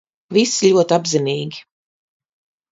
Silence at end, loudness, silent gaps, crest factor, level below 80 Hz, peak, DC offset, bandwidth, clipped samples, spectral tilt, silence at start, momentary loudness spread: 1.1 s; -17 LUFS; none; 18 dB; -66 dBFS; -2 dBFS; under 0.1%; 7.8 kHz; under 0.1%; -4 dB/octave; 0.3 s; 13 LU